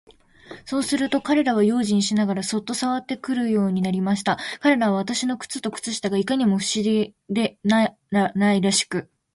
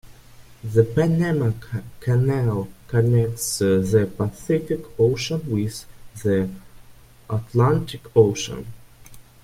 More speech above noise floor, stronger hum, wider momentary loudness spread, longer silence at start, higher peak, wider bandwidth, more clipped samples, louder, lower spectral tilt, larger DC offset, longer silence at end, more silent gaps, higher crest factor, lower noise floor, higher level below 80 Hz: about the same, 23 dB vs 26 dB; neither; second, 7 LU vs 12 LU; first, 0.5 s vs 0.05 s; about the same, -6 dBFS vs -4 dBFS; second, 11.5 kHz vs 16 kHz; neither; about the same, -22 LUFS vs -22 LUFS; second, -4.5 dB/octave vs -6.5 dB/octave; neither; about the same, 0.3 s vs 0.2 s; neither; about the same, 16 dB vs 18 dB; about the same, -44 dBFS vs -47 dBFS; second, -62 dBFS vs -48 dBFS